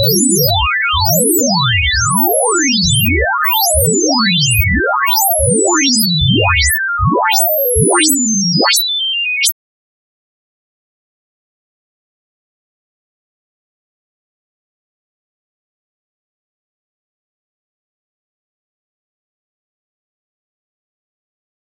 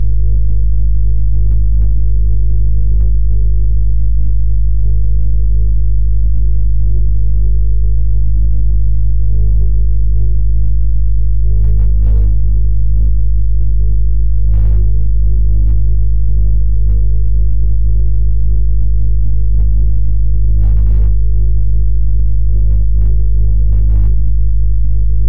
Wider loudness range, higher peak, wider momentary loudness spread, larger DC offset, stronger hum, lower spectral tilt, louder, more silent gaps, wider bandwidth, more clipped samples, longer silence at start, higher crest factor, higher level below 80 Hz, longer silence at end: first, 5 LU vs 1 LU; about the same, 0 dBFS vs -2 dBFS; about the same, 3 LU vs 2 LU; second, under 0.1% vs 30%; neither; second, -2.5 dB/octave vs -13.5 dB/octave; first, -11 LUFS vs -15 LUFS; neither; first, 16.5 kHz vs 0.7 kHz; neither; about the same, 0 s vs 0 s; first, 16 dB vs 8 dB; second, -32 dBFS vs -12 dBFS; first, 12.1 s vs 0 s